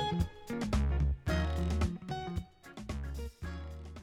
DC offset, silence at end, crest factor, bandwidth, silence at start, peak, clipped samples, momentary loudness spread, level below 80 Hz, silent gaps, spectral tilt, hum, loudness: under 0.1%; 0 s; 14 dB; 13.5 kHz; 0 s; -20 dBFS; under 0.1%; 11 LU; -38 dBFS; none; -6.5 dB/octave; none; -36 LUFS